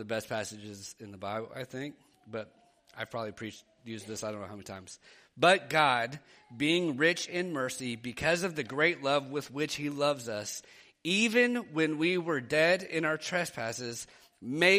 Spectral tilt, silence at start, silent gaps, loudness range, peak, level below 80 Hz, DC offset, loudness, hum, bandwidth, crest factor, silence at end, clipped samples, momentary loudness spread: -4 dB/octave; 0 s; none; 12 LU; -10 dBFS; -70 dBFS; under 0.1%; -30 LUFS; none; 15 kHz; 22 dB; 0 s; under 0.1%; 18 LU